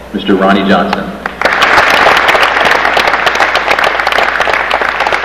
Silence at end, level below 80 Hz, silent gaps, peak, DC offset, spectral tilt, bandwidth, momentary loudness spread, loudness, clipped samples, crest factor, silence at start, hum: 0 s; -36 dBFS; none; 0 dBFS; 0.5%; -4 dB/octave; 17.5 kHz; 6 LU; -8 LUFS; 1%; 10 dB; 0 s; none